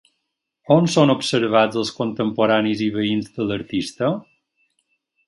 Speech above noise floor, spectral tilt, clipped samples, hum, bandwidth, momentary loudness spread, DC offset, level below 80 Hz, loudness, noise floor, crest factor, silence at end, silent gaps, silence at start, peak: 58 dB; -5.5 dB/octave; under 0.1%; none; 11.5 kHz; 8 LU; under 0.1%; -58 dBFS; -20 LUFS; -77 dBFS; 20 dB; 1.05 s; none; 0.7 s; 0 dBFS